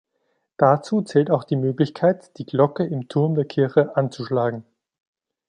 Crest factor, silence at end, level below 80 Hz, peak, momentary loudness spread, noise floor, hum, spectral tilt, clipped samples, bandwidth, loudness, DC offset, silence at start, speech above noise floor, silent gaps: 18 dB; 0.85 s; -68 dBFS; -2 dBFS; 7 LU; -72 dBFS; none; -8 dB/octave; under 0.1%; 9.8 kHz; -21 LUFS; under 0.1%; 0.6 s; 51 dB; none